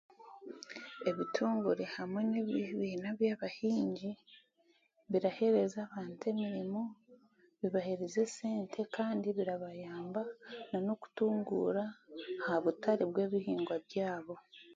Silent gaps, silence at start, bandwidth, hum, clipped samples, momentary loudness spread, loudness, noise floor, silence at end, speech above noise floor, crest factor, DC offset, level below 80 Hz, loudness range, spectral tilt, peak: none; 0.2 s; 7.4 kHz; none; under 0.1%; 12 LU; -36 LUFS; -73 dBFS; 0 s; 37 dB; 18 dB; under 0.1%; -80 dBFS; 3 LU; -6 dB/octave; -18 dBFS